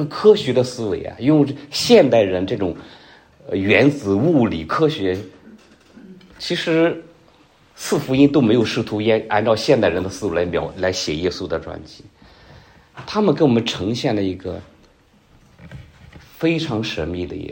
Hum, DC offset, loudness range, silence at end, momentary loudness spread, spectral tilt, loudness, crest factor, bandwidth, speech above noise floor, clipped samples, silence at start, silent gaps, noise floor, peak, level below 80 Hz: none; under 0.1%; 7 LU; 0 s; 13 LU; -5.5 dB/octave; -18 LUFS; 18 dB; 16.5 kHz; 35 dB; under 0.1%; 0 s; none; -53 dBFS; 0 dBFS; -48 dBFS